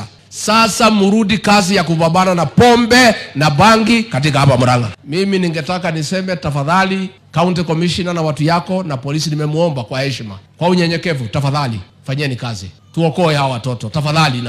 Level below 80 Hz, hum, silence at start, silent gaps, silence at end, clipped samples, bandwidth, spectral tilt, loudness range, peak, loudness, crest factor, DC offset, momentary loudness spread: -44 dBFS; none; 0 s; none; 0 s; under 0.1%; 15.5 kHz; -5 dB/octave; 7 LU; 0 dBFS; -14 LUFS; 14 dB; under 0.1%; 11 LU